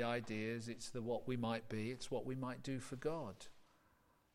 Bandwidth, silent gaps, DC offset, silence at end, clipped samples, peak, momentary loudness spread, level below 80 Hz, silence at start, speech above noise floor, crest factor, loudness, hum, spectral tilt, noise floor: 16 kHz; none; under 0.1%; 0.7 s; under 0.1%; -28 dBFS; 6 LU; -68 dBFS; 0 s; 31 dB; 16 dB; -44 LUFS; none; -5.5 dB/octave; -74 dBFS